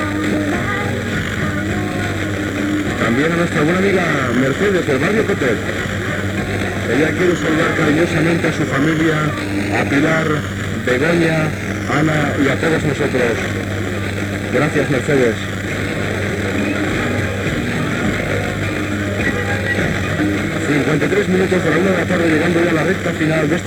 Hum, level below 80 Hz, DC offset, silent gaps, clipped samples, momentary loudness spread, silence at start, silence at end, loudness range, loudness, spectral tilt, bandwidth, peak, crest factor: none; -38 dBFS; under 0.1%; none; under 0.1%; 5 LU; 0 s; 0 s; 3 LU; -17 LUFS; -6 dB/octave; over 20 kHz; -2 dBFS; 14 dB